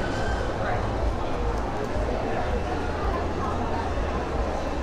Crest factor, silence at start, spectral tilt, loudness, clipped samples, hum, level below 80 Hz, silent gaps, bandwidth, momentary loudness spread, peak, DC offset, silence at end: 12 dB; 0 s; -6.5 dB/octave; -28 LUFS; under 0.1%; none; -32 dBFS; none; 11 kHz; 1 LU; -14 dBFS; under 0.1%; 0 s